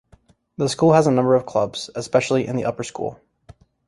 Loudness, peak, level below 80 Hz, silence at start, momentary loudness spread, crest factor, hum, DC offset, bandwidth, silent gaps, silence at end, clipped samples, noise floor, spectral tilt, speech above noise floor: -20 LUFS; -2 dBFS; -56 dBFS; 0.6 s; 13 LU; 20 dB; none; under 0.1%; 11.5 kHz; none; 0.75 s; under 0.1%; -55 dBFS; -6 dB/octave; 36 dB